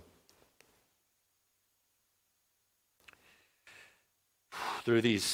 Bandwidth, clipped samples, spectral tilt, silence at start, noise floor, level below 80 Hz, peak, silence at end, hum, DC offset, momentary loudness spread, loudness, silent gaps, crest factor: 16.5 kHz; under 0.1%; -4 dB/octave; 3.65 s; -78 dBFS; -78 dBFS; -16 dBFS; 0 s; none; under 0.1%; 28 LU; -32 LUFS; none; 22 dB